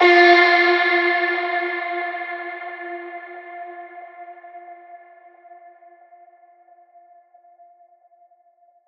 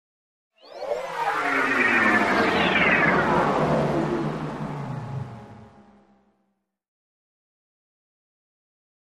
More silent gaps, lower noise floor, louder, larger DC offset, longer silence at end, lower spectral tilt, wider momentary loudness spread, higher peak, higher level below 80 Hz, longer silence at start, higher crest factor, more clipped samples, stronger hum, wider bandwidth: neither; second, -58 dBFS vs -74 dBFS; first, -17 LUFS vs -22 LUFS; neither; first, 3.9 s vs 3.4 s; second, -2.5 dB/octave vs -5.5 dB/octave; first, 28 LU vs 15 LU; first, 0 dBFS vs -6 dBFS; second, -74 dBFS vs -52 dBFS; second, 0 s vs 0.65 s; about the same, 22 dB vs 18 dB; neither; neither; second, 6.4 kHz vs 15 kHz